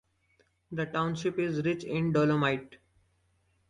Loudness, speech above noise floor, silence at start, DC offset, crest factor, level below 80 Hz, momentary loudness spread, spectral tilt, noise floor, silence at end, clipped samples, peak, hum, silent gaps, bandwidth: -30 LUFS; 42 dB; 0.7 s; under 0.1%; 18 dB; -64 dBFS; 10 LU; -7 dB/octave; -71 dBFS; 0.95 s; under 0.1%; -14 dBFS; none; none; 10.5 kHz